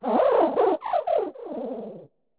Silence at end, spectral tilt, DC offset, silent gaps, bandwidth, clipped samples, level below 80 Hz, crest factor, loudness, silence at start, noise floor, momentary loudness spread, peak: 0.35 s; -9 dB/octave; under 0.1%; none; 4 kHz; under 0.1%; -68 dBFS; 14 dB; -24 LUFS; 0 s; -45 dBFS; 14 LU; -10 dBFS